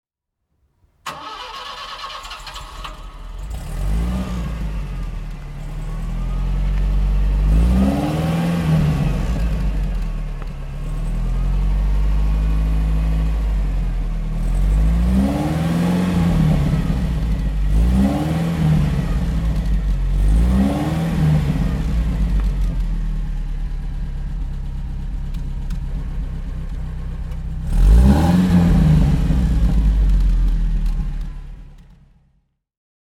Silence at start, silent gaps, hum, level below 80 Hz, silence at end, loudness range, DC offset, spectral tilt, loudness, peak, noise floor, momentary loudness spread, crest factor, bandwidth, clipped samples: 1.05 s; none; none; -20 dBFS; 1.2 s; 11 LU; under 0.1%; -7.5 dB/octave; -20 LUFS; 0 dBFS; -75 dBFS; 14 LU; 18 dB; 12.5 kHz; under 0.1%